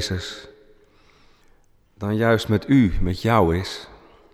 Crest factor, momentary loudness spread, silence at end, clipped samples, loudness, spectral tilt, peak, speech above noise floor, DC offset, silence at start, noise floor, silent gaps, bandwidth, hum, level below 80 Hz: 18 dB; 15 LU; 0.4 s; under 0.1%; -21 LUFS; -6.5 dB/octave; -4 dBFS; 36 dB; under 0.1%; 0 s; -56 dBFS; none; 14 kHz; none; -36 dBFS